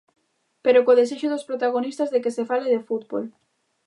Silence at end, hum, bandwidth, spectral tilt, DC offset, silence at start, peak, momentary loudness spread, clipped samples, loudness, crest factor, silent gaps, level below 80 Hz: 0.55 s; none; 11 kHz; -4.5 dB/octave; under 0.1%; 0.65 s; -6 dBFS; 11 LU; under 0.1%; -22 LUFS; 18 dB; none; -82 dBFS